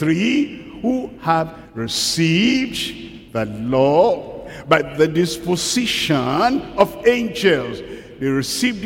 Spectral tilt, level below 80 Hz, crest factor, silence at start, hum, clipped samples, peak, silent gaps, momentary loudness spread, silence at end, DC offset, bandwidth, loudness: -4.5 dB/octave; -48 dBFS; 18 dB; 0 s; none; under 0.1%; 0 dBFS; none; 12 LU; 0 s; under 0.1%; 17 kHz; -19 LUFS